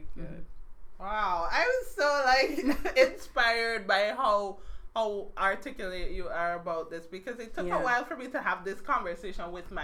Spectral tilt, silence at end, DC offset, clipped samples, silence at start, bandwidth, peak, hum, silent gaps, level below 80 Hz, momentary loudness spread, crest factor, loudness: -3.5 dB/octave; 0 s; under 0.1%; under 0.1%; 0 s; 16.5 kHz; -10 dBFS; none; none; -46 dBFS; 15 LU; 20 dB; -29 LUFS